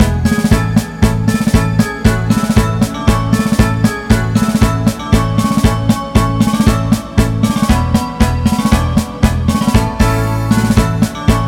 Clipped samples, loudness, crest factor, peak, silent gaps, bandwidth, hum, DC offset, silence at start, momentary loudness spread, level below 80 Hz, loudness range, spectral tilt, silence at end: 0.4%; -13 LUFS; 12 dB; 0 dBFS; none; 17 kHz; none; under 0.1%; 0 s; 3 LU; -20 dBFS; 0 LU; -6 dB/octave; 0 s